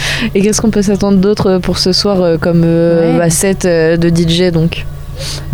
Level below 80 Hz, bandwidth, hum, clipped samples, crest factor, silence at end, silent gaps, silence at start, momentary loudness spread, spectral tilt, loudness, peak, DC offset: -28 dBFS; 19.5 kHz; none; under 0.1%; 10 dB; 0 s; none; 0 s; 6 LU; -5 dB/octave; -11 LUFS; 0 dBFS; under 0.1%